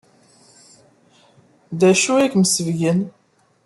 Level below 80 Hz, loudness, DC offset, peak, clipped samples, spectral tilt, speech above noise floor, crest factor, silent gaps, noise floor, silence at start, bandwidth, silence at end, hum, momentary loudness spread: -64 dBFS; -17 LUFS; under 0.1%; -4 dBFS; under 0.1%; -4.5 dB/octave; 38 dB; 18 dB; none; -54 dBFS; 1.7 s; 12.5 kHz; 0.55 s; none; 12 LU